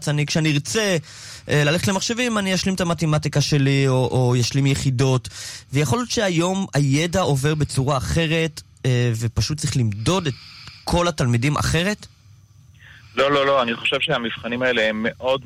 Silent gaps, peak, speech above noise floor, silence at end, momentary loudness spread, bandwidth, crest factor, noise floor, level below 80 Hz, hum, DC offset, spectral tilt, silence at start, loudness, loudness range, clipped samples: none; -8 dBFS; 29 dB; 0 s; 7 LU; 15.5 kHz; 12 dB; -49 dBFS; -42 dBFS; none; under 0.1%; -5 dB/octave; 0 s; -20 LUFS; 3 LU; under 0.1%